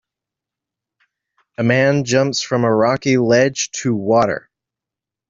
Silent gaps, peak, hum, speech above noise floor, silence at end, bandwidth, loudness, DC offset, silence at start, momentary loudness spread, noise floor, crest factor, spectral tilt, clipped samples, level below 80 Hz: none; -2 dBFS; none; 71 dB; 0.9 s; 7.8 kHz; -16 LUFS; under 0.1%; 1.6 s; 7 LU; -86 dBFS; 16 dB; -5 dB/octave; under 0.1%; -58 dBFS